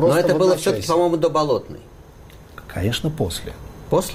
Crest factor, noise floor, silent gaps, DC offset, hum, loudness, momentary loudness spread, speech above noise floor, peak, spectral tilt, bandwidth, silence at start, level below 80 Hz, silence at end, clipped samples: 14 dB; -43 dBFS; none; under 0.1%; none; -20 LUFS; 21 LU; 24 dB; -8 dBFS; -5.5 dB/octave; 16 kHz; 0 s; -42 dBFS; 0 s; under 0.1%